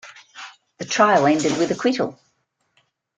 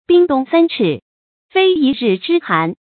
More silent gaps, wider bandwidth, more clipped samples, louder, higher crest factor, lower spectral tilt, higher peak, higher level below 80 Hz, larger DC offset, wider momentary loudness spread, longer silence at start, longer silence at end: second, none vs 1.02-1.49 s; first, 9.4 kHz vs 4.6 kHz; neither; second, -19 LUFS vs -15 LUFS; first, 20 dB vs 14 dB; second, -4 dB/octave vs -11 dB/octave; about the same, -2 dBFS vs 0 dBFS; second, -64 dBFS vs -58 dBFS; neither; first, 24 LU vs 6 LU; about the same, 0.05 s vs 0.1 s; first, 1.05 s vs 0.2 s